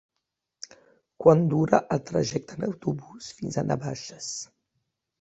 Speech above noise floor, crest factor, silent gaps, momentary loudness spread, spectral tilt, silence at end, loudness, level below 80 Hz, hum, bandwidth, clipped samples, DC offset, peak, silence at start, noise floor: 57 dB; 24 dB; none; 23 LU; -6 dB/octave; 0.8 s; -26 LUFS; -60 dBFS; none; 8.2 kHz; under 0.1%; under 0.1%; -4 dBFS; 1.2 s; -83 dBFS